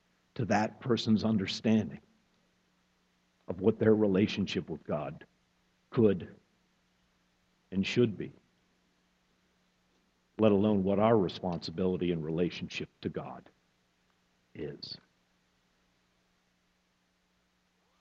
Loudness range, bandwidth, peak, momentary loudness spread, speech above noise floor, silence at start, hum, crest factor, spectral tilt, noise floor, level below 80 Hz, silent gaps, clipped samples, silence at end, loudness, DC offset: 19 LU; 7.8 kHz; -12 dBFS; 17 LU; 44 dB; 0.35 s; none; 22 dB; -7 dB/octave; -74 dBFS; -66 dBFS; none; under 0.1%; 3.05 s; -30 LUFS; under 0.1%